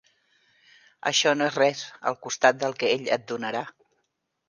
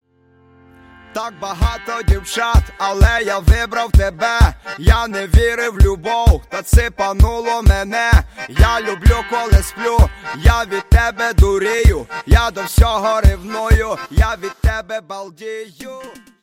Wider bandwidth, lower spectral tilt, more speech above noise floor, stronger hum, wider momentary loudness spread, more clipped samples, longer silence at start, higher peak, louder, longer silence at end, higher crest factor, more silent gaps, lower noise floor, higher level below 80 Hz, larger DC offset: second, 10.5 kHz vs 16 kHz; second, -2.5 dB/octave vs -5.5 dB/octave; first, 52 dB vs 38 dB; neither; about the same, 10 LU vs 11 LU; neither; about the same, 1.05 s vs 1.15 s; second, -4 dBFS vs 0 dBFS; second, -25 LUFS vs -16 LUFS; first, 0.8 s vs 0.3 s; first, 24 dB vs 14 dB; neither; first, -77 dBFS vs -52 dBFS; second, -78 dBFS vs -16 dBFS; neither